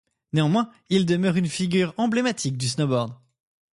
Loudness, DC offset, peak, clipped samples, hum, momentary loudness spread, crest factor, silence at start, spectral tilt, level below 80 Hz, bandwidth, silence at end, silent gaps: -23 LUFS; under 0.1%; -8 dBFS; under 0.1%; none; 4 LU; 16 dB; 0.35 s; -5.5 dB/octave; -62 dBFS; 11.5 kHz; 0.6 s; none